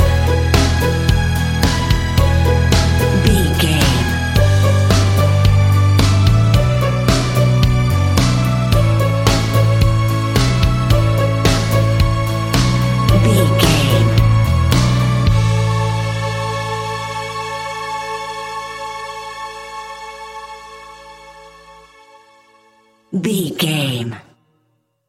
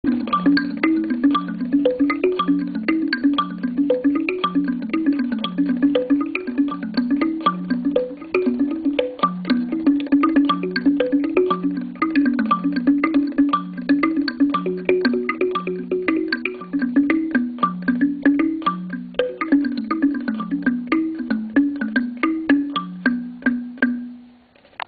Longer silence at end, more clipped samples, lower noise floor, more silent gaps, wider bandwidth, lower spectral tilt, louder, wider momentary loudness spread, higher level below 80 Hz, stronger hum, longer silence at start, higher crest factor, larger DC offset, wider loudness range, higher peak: first, 0.9 s vs 0.6 s; neither; first, -64 dBFS vs -51 dBFS; neither; first, 16.5 kHz vs 4.9 kHz; second, -5.5 dB/octave vs -9.5 dB/octave; first, -15 LUFS vs -20 LUFS; first, 14 LU vs 5 LU; first, -24 dBFS vs -56 dBFS; neither; about the same, 0 s vs 0.05 s; about the same, 14 dB vs 18 dB; neither; first, 14 LU vs 2 LU; about the same, 0 dBFS vs -2 dBFS